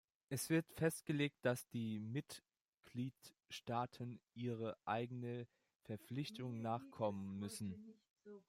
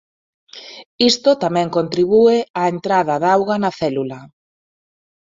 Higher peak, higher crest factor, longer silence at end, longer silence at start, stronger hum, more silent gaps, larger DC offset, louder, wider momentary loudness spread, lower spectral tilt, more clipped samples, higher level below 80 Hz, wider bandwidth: second, -24 dBFS vs -2 dBFS; about the same, 20 dB vs 16 dB; second, 0.1 s vs 1.1 s; second, 0.3 s vs 0.55 s; neither; first, 2.61-2.81 s, 5.76-5.80 s, 8.10-8.16 s vs 0.86-0.98 s, 2.50-2.54 s; neither; second, -45 LUFS vs -16 LUFS; second, 14 LU vs 22 LU; about the same, -5.5 dB/octave vs -5 dB/octave; neither; second, -82 dBFS vs -58 dBFS; first, 16 kHz vs 7.8 kHz